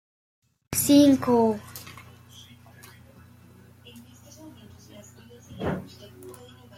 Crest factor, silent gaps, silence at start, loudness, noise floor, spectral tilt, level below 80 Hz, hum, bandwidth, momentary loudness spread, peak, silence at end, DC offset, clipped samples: 22 dB; none; 0.7 s; -22 LUFS; -52 dBFS; -4.5 dB/octave; -60 dBFS; 60 Hz at -50 dBFS; 16 kHz; 30 LU; -6 dBFS; 0.45 s; under 0.1%; under 0.1%